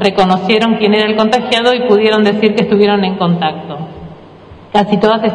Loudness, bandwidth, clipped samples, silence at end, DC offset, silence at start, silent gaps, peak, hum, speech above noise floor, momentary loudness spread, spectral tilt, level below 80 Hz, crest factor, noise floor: -11 LUFS; 10.5 kHz; 0.2%; 0 s; under 0.1%; 0 s; none; 0 dBFS; none; 25 dB; 11 LU; -6.5 dB/octave; -48 dBFS; 12 dB; -36 dBFS